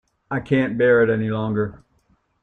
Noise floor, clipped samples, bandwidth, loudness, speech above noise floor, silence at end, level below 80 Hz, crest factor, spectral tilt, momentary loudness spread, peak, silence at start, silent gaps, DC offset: -63 dBFS; under 0.1%; 4.2 kHz; -20 LUFS; 44 dB; 0.65 s; -54 dBFS; 16 dB; -9 dB/octave; 13 LU; -6 dBFS; 0.3 s; none; under 0.1%